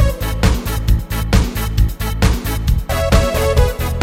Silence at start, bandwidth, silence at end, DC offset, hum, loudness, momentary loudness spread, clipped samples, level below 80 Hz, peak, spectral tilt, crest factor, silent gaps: 0 s; 16.5 kHz; 0 s; under 0.1%; none; -17 LUFS; 4 LU; under 0.1%; -18 dBFS; 0 dBFS; -5.5 dB/octave; 14 dB; none